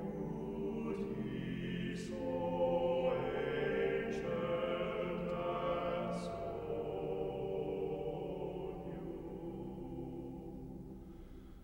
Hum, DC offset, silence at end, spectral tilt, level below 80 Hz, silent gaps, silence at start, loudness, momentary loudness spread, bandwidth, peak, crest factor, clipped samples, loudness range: none; under 0.1%; 0 s; -7.5 dB/octave; -56 dBFS; none; 0 s; -39 LUFS; 11 LU; 16.5 kHz; -24 dBFS; 16 dB; under 0.1%; 7 LU